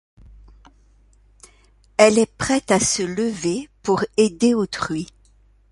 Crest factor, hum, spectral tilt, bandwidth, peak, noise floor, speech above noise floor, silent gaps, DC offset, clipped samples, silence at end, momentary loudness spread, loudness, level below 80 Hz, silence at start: 22 dB; none; -4 dB/octave; 11.5 kHz; 0 dBFS; -55 dBFS; 36 dB; none; under 0.1%; under 0.1%; 0.65 s; 12 LU; -20 LUFS; -50 dBFS; 2 s